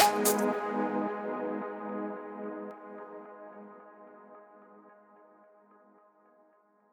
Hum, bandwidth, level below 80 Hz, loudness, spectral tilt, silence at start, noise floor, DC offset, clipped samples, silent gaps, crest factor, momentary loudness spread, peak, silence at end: none; over 20 kHz; -78 dBFS; -33 LUFS; -3 dB/octave; 0 s; -66 dBFS; under 0.1%; under 0.1%; none; 28 dB; 25 LU; -8 dBFS; 2 s